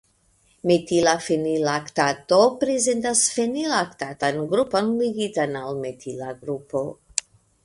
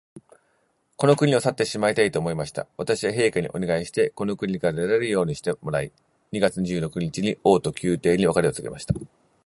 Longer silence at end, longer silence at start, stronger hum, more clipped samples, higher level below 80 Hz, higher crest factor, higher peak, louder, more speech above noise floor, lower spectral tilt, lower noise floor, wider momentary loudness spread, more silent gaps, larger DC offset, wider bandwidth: about the same, 0.45 s vs 0.4 s; first, 0.65 s vs 0.15 s; neither; neither; second, -60 dBFS vs -52 dBFS; about the same, 22 dB vs 20 dB; first, 0 dBFS vs -4 dBFS; about the same, -23 LUFS vs -24 LUFS; second, 40 dB vs 45 dB; second, -3.5 dB/octave vs -5.5 dB/octave; second, -62 dBFS vs -68 dBFS; about the same, 11 LU vs 9 LU; neither; neither; about the same, 11.5 kHz vs 11.5 kHz